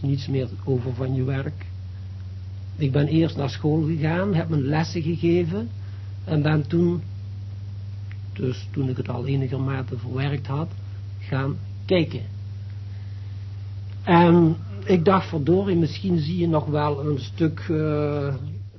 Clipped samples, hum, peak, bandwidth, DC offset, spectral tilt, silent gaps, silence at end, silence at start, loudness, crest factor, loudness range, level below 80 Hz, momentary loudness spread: under 0.1%; none; -4 dBFS; 6.2 kHz; under 0.1%; -8.5 dB/octave; none; 0 s; 0 s; -23 LUFS; 18 dB; 7 LU; -44 dBFS; 15 LU